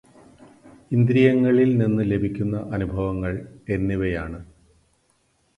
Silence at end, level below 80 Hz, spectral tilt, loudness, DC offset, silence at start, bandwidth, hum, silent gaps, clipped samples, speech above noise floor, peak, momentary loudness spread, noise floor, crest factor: 1.15 s; -42 dBFS; -9.5 dB/octave; -22 LUFS; under 0.1%; 0.65 s; 10.5 kHz; none; none; under 0.1%; 45 dB; -4 dBFS; 13 LU; -65 dBFS; 18 dB